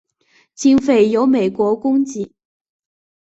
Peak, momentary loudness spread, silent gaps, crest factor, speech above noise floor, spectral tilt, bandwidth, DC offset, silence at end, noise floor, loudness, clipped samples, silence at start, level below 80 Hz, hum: -2 dBFS; 11 LU; none; 14 dB; 43 dB; -5.5 dB/octave; 8 kHz; under 0.1%; 0.95 s; -58 dBFS; -16 LUFS; under 0.1%; 0.6 s; -56 dBFS; none